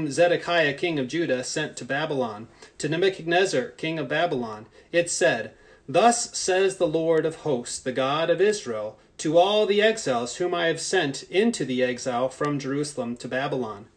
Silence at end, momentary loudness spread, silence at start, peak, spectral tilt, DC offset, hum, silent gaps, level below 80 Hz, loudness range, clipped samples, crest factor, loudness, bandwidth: 0.1 s; 9 LU; 0 s; -6 dBFS; -4 dB/octave; under 0.1%; none; none; -64 dBFS; 3 LU; under 0.1%; 18 dB; -24 LUFS; 10 kHz